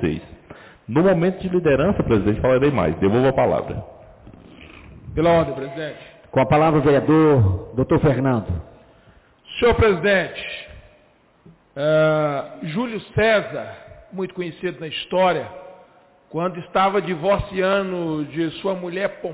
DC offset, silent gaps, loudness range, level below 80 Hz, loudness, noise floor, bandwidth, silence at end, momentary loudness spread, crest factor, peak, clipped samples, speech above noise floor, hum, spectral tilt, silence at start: under 0.1%; none; 5 LU; -40 dBFS; -20 LUFS; -56 dBFS; 4 kHz; 0 s; 15 LU; 12 dB; -8 dBFS; under 0.1%; 37 dB; none; -11 dB/octave; 0 s